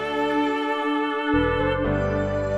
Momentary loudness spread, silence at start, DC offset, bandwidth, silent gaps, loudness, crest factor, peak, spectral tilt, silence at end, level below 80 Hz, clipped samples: 2 LU; 0 s; under 0.1%; 9.4 kHz; none; -23 LUFS; 14 dB; -10 dBFS; -7 dB/octave; 0 s; -38 dBFS; under 0.1%